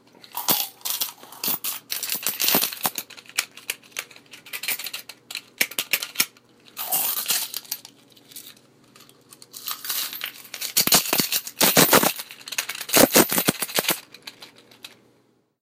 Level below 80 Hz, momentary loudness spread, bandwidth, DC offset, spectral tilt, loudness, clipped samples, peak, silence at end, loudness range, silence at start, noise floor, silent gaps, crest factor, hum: -64 dBFS; 19 LU; 16.5 kHz; under 0.1%; -1.5 dB/octave; -22 LUFS; under 0.1%; -2 dBFS; 0.75 s; 10 LU; 0.35 s; -63 dBFS; none; 24 dB; none